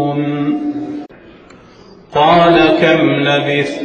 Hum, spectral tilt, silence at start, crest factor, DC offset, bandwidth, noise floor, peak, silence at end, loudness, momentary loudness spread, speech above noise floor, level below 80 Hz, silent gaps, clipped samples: none; -6.5 dB/octave; 0 s; 14 dB; under 0.1%; 8.8 kHz; -40 dBFS; 0 dBFS; 0 s; -12 LUFS; 14 LU; 29 dB; -46 dBFS; none; under 0.1%